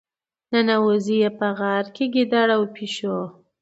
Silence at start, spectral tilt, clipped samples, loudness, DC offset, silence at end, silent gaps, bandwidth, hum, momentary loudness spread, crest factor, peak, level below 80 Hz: 0.5 s; -5.5 dB/octave; under 0.1%; -21 LUFS; under 0.1%; 0.3 s; none; 8 kHz; none; 9 LU; 16 dB; -4 dBFS; -72 dBFS